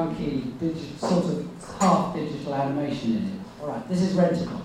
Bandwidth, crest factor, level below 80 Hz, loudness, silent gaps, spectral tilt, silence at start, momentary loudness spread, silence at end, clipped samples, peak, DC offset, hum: 12.5 kHz; 18 dB; -52 dBFS; -26 LUFS; none; -6.5 dB/octave; 0 s; 11 LU; 0 s; under 0.1%; -8 dBFS; under 0.1%; none